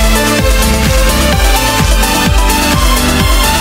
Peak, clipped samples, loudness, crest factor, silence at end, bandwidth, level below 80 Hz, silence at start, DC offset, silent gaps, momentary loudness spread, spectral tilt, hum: 0 dBFS; under 0.1%; -10 LUFS; 8 dB; 0 s; 16.5 kHz; -12 dBFS; 0 s; under 0.1%; none; 0 LU; -3.5 dB/octave; none